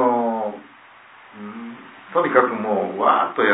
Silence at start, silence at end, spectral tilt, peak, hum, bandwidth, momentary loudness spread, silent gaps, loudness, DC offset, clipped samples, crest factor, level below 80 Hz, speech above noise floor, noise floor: 0 s; 0 s; -9 dB/octave; -2 dBFS; none; 4 kHz; 20 LU; none; -20 LUFS; under 0.1%; under 0.1%; 20 dB; -76 dBFS; 29 dB; -47 dBFS